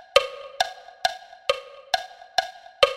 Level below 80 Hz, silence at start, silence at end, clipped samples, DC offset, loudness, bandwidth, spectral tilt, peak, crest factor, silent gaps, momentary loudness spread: -58 dBFS; 0.15 s; 0 s; under 0.1%; under 0.1%; -27 LUFS; 16 kHz; 0 dB/octave; 0 dBFS; 26 dB; none; 8 LU